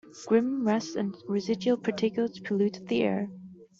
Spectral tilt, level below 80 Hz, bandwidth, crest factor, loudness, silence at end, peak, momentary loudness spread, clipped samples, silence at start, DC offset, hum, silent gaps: -6 dB/octave; -70 dBFS; 7.6 kHz; 16 dB; -29 LUFS; 0.15 s; -12 dBFS; 7 LU; under 0.1%; 0.05 s; under 0.1%; none; none